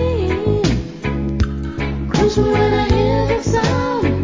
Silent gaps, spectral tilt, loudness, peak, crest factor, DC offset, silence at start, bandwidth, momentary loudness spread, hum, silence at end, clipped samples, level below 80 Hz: none; -6.5 dB/octave; -18 LUFS; -2 dBFS; 16 dB; under 0.1%; 0 s; 7.6 kHz; 7 LU; none; 0 s; under 0.1%; -26 dBFS